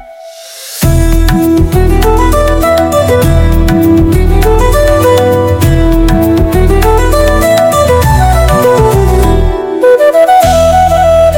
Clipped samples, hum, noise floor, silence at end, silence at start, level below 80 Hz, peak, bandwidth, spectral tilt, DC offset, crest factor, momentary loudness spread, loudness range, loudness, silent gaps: 4%; none; -29 dBFS; 0 s; 0 s; -12 dBFS; 0 dBFS; 17.5 kHz; -6 dB/octave; under 0.1%; 6 dB; 4 LU; 1 LU; -8 LUFS; none